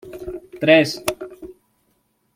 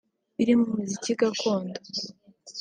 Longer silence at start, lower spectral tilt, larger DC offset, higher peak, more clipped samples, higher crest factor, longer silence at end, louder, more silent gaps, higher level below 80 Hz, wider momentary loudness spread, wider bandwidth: second, 0.05 s vs 0.4 s; about the same, -4.5 dB/octave vs -4.5 dB/octave; neither; first, 0 dBFS vs -10 dBFS; neither; first, 22 dB vs 16 dB; first, 0.85 s vs 0 s; first, -17 LUFS vs -26 LUFS; neither; first, -54 dBFS vs -68 dBFS; first, 21 LU vs 16 LU; first, 16.5 kHz vs 9.6 kHz